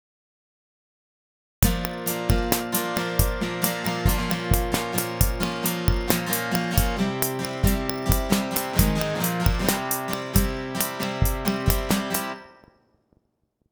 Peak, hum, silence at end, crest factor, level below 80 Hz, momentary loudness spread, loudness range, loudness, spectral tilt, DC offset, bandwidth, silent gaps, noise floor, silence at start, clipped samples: 0 dBFS; none; 1.2 s; 24 dB; -30 dBFS; 4 LU; 2 LU; -24 LUFS; -4.5 dB/octave; under 0.1%; over 20 kHz; none; -72 dBFS; 1.6 s; under 0.1%